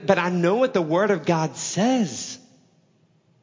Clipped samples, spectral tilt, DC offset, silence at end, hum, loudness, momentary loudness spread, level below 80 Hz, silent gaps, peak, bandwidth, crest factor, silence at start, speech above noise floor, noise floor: under 0.1%; -5 dB/octave; under 0.1%; 1.05 s; none; -22 LUFS; 10 LU; -70 dBFS; none; -4 dBFS; 7.6 kHz; 20 dB; 0 s; 40 dB; -61 dBFS